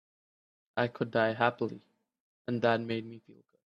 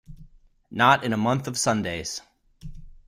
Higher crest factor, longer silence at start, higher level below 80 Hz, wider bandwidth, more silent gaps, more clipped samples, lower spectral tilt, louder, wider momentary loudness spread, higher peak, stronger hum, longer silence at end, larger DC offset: about the same, 24 dB vs 22 dB; first, 0.75 s vs 0.1 s; second, -74 dBFS vs -48 dBFS; second, 7.6 kHz vs 16 kHz; first, 2.20-2.45 s vs none; neither; first, -7.5 dB/octave vs -4 dB/octave; second, -32 LUFS vs -23 LUFS; second, 15 LU vs 19 LU; second, -10 dBFS vs -4 dBFS; neither; first, 0.35 s vs 0.15 s; neither